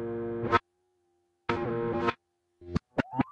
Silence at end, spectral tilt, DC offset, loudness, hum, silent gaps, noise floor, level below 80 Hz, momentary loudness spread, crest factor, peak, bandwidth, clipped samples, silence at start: 0 s; -7.5 dB/octave; under 0.1%; -32 LUFS; none; none; -74 dBFS; -54 dBFS; 8 LU; 24 dB; -8 dBFS; 8.4 kHz; under 0.1%; 0 s